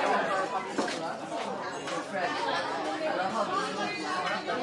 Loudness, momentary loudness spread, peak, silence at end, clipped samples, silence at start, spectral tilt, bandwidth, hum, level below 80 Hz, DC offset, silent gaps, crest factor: -31 LUFS; 5 LU; -14 dBFS; 0 s; under 0.1%; 0 s; -3.5 dB/octave; 11.5 kHz; none; -76 dBFS; under 0.1%; none; 16 dB